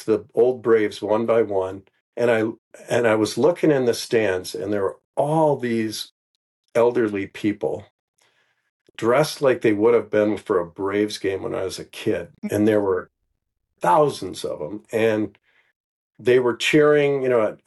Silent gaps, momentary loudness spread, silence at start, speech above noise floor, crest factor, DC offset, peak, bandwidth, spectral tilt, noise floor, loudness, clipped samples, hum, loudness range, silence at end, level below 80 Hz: 2.01-2.13 s, 2.58-2.71 s, 5.05-5.13 s, 6.11-6.64 s, 7.91-8.14 s, 8.70-8.94 s, 15.76-16.11 s; 10 LU; 0 s; 44 dB; 14 dB; under 0.1%; -6 dBFS; 12.5 kHz; -5.5 dB/octave; -64 dBFS; -21 LUFS; under 0.1%; none; 3 LU; 0.1 s; -68 dBFS